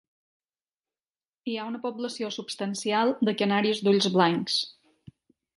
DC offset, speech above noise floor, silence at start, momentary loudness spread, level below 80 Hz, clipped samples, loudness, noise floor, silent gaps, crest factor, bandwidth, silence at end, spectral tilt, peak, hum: under 0.1%; over 64 dB; 1.45 s; 11 LU; -74 dBFS; under 0.1%; -26 LUFS; under -90 dBFS; none; 22 dB; 11.5 kHz; 0.85 s; -4.5 dB/octave; -8 dBFS; none